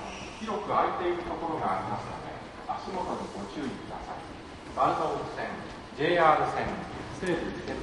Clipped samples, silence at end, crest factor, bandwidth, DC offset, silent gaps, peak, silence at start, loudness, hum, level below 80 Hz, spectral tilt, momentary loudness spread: under 0.1%; 0 s; 24 dB; 11.5 kHz; under 0.1%; none; -8 dBFS; 0 s; -31 LUFS; none; -52 dBFS; -5.5 dB/octave; 14 LU